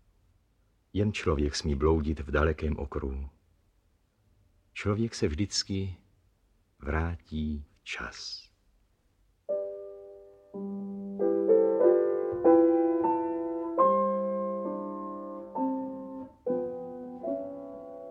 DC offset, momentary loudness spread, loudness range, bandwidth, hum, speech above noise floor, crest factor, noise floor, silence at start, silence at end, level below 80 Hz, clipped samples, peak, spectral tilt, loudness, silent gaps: under 0.1%; 18 LU; 12 LU; 9.8 kHz; none; 39 dB; 20 dB; -69 dBFS; 0.95 s; 0 s; -44 dBFS; under 0.1%; -10 dBFS; -6 dB/octave; -29 LUFS; none